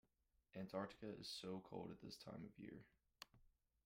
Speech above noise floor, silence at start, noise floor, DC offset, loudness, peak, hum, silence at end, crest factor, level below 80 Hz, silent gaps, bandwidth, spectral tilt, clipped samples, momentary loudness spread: 31 dB; 0.55 s; -85 dBFS; under 0.1%; -55 LUFS; -34 dBFS; none; 0.35 s; 22 dB; -80 dBFS; none; 16 kHz; -5 dB/octave; under 0.1%; 13 LU